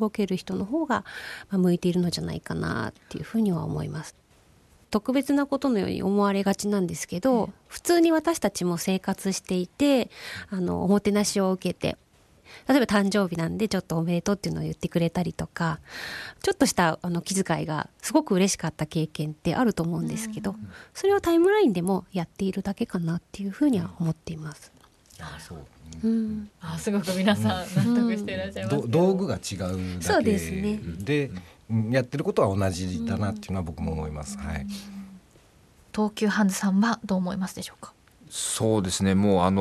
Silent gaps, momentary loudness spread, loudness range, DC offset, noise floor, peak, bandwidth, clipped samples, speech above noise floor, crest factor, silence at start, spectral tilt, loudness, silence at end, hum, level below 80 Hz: none; 13 LU; 5 LU; under 0.1%; -58 dBFS; -6 dBFS; 13 kHz; under 0.1%; 32 dB; 20 dB; 0 s; -5.5 dB/octave; -26 LUFS; 0 s; none; -52 dBFS